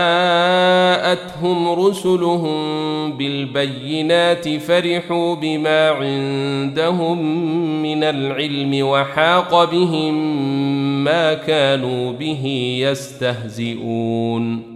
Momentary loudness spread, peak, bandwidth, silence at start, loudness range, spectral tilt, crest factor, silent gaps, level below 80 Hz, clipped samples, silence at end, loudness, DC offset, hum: 8 LU; -2 dBFS; 14 kHz; 0 s; 2 LU; -5.5 dB/octave; 16 dB; none; -60 dBFS; under 0.1%; 0 s; -18 LUFS; under 0.1%; none